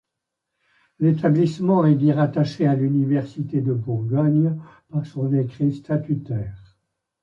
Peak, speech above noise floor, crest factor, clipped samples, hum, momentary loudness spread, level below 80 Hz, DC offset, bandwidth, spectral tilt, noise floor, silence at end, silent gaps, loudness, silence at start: -6 dBFS; 62 dB; 16 dB; under 0.1%; none; 11 LU; -56 dBFS; under 0.1%; 7.4 kHz; -9.5 dB/octave; -82 dBFS; 0.65 s; none; -21 LUFS; 1 s